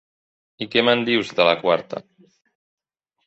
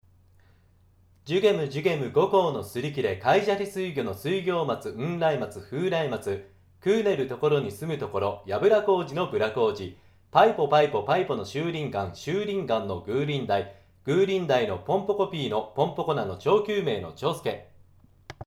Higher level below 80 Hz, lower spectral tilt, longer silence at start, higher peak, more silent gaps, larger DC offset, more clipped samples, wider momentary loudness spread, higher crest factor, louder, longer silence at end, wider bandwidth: about the same, -66 dBFS vs -62 dBFS; about the same, -5 dB/octave vs -6 dB/octave; second, 0.6 s vs 1.25 s; first, -2 dBFS vs -6 dBFS; neither; neither; neither; first, 16 LU vs 9 LU; about the same, 22 dB vs 20 dB; first, -19 LUFS vs -26 LUFS; first, 1.25 s vs 0.05 s; second, 8.2 kHz vs 15 kHz